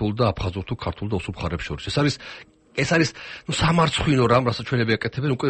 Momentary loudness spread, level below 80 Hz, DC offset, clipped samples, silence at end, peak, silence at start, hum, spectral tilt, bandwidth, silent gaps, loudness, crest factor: 11 LU; -42 dBFS; under 0.1%; under 0.1%; 0 s; -6 dBFS; 0 s; none; -5.5 dB/octave; 8.8 kHz; none; -23 LUFS; 16 dB